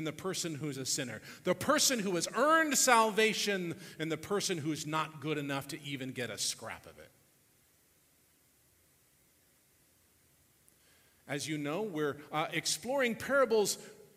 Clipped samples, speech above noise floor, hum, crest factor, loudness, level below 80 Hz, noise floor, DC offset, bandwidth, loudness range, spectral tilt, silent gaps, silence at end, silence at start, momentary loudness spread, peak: under 0.1%; 36 dB; none; 24 dB; -32 LUFS; -74 dBFS; -69 dBFS; under 0.1%; 16 kHz; 14 LU; -3 dB/octave; none; 0.1 s; 0 s; 14 LU; -10 dBFS